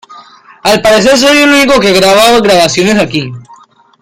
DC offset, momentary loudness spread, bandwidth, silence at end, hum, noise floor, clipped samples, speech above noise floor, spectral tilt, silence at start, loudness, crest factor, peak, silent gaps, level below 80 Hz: under 0.1%; 9 LU; 17 kHz; 0.6 s; none; -40 dBFS; 0.4%; 33 dB; -3.5 dB/octave; 0.1 s; -6 LUFS; 8 dB; 0 dBFS; none; -38 dBFS